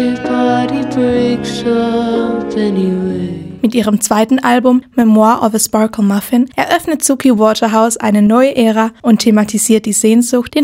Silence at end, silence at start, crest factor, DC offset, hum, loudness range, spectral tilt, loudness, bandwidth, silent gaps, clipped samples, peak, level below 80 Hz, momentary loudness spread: 0 s; 0 s; 12 dB; under 0.1%; none; 4 LU; -4.5 dB/octave; -12 LUFS; 16.5 kHz; none; under 0.1%; 0 dBFS; -46 dBFS; 6 LU